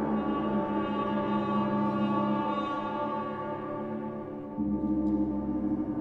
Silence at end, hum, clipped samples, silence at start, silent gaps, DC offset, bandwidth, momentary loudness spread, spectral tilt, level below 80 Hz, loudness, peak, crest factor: 0 s; none; under 0.1%; 0 s; none; under 0.1%; 4.9 kHz; 7 LU; -9 dB/octave; -52 dBFS; -31 LUFS; -18 dBFS; 12 dB